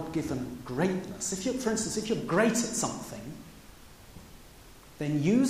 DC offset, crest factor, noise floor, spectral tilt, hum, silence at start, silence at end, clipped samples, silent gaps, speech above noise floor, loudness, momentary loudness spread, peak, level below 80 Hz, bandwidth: under 0.1%; 20 dB; -52 dBFS; -4.5 dB/octave; none; 0 s; 0 s; under 0.1%; none; 22 dB; -30 LUFS; 24 LU; -12 dBFS; -56 dBFS; 15.5 kHz